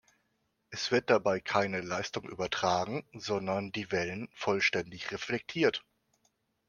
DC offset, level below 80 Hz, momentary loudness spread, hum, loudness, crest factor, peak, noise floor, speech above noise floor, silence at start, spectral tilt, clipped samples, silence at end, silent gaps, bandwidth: under 0.1%; -68 dBFS; 10 LU; none; -32 LUFS; 22 dB; -10 dBFS; -78 dBFS; 46 dB; 0.7 s; -4 dB/octave; under 0.1%; 0.9 s; none; 10.5 kHz